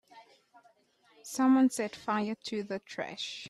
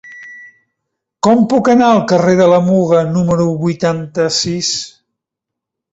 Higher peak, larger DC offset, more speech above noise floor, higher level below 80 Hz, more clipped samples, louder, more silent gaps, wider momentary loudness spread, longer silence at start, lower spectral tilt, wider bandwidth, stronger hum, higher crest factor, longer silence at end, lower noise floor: second, -16 dBFS vs -2 dBFS; neither; second, 36 dB vs 69 dB; second, -78 dBFS vs -50 dBFS; neither; second, -31 LUFS vs -12 LUFS; neither; first, 15 LU vs 10 LU; about the same, 0.15 s vs 0.05 s; second, -4 dB/octave vs -5.5 dB/octave; first, 13 kHz vs 8 kHz; neither; about the same, 16 dB vs 12 dB; second, 0 s vs 1.05 s; second, -67 dBFS vs -81 dBFS